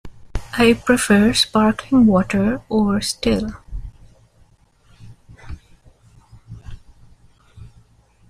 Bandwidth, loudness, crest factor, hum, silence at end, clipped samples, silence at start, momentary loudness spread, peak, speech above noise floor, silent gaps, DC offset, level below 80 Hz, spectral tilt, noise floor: 15.5 kHz; -17 LUFS; 18 dB; none; 0.6 s; under 0.1%; 0.05 s; 25 LU; -2 dBFS; 38 dB; none; under 0.1%; -38 dBFS; -5 dB/octave; -54 dBFS